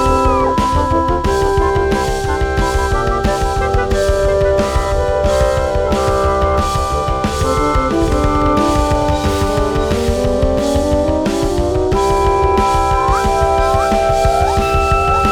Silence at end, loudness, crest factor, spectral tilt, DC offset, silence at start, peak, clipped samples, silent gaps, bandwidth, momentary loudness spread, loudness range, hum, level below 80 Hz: 0 s; -15 LUFS; 12 dB; -6 dB/octave; under 0.1%; 0 s; -2 dBFS; under 0.1%; none; 17.5 kHz; 3 LU; 2 LU; none; -20 dBFS